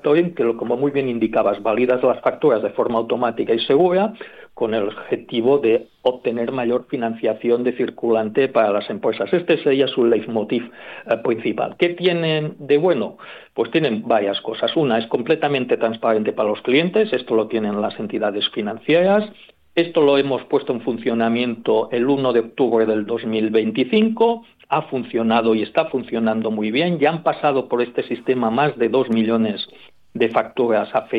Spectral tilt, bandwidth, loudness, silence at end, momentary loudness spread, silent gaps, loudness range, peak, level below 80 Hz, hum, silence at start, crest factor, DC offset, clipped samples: -8 dB/octave; 5 kHz; -19 LUFS; 0 s; 6 LU; none; 2 LU; -4 dBFS; -64 dBFS; none; 0.05 s; 16 dB; under 0.1%; under 0.1%